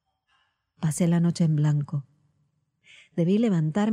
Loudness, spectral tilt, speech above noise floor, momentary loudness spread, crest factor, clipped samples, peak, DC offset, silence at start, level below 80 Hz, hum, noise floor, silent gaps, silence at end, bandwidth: -25 LUFS; -7.5 dB/octave; 48 dB; 10 LU; 14 dB; under 0.1%; -12 dBFS; under 0.1%; 0.8 s; -66 dBFS; none; -71 dBFS; none; 0 s; 13 kHz